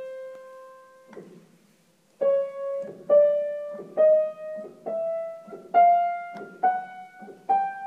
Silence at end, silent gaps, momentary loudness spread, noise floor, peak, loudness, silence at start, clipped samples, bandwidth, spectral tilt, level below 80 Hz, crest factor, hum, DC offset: 0 s; none; 22 LU; -62 dBFS; -8 dBFS; -24 LUFS; 0 s; under 0.1%; 4.6 kHz; -6 dB/octave; -86 dBFS; 18 dB; none; under 0.1%